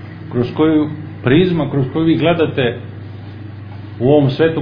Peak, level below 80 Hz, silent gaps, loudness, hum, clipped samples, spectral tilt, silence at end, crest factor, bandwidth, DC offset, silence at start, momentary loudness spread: 0 dBFS; -44 dBFS; none; -15 LUFS; none; under 0.1%; -10 dB/octave; 0 s; 16 dB; 5.2 kHz; under 0.1%; 0 s; 19 LU